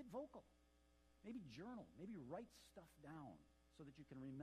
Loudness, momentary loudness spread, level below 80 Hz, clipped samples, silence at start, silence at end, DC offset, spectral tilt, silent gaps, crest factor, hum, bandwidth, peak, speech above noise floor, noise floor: -58 LUFS; 10 LU; -78 dBFS; under 0.1%; 0 s; 0 s; under 0.1%; -6.5 dB/octave; none; 18 dB; none; 14 kHz; -40 dBFS; 19 dB; -76 dBFS